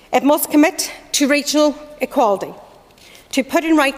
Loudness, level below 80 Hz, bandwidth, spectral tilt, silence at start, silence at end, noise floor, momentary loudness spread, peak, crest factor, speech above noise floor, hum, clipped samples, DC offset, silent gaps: -17 LUFS; -54 dBFS; 16 kHz; -2 dB/octave; 0.1 s; 0 s; -45 dBFS; 9 LU; -4 dBFS; 14 dB; 29 dB; none; under 0.1%; under 0.1%; none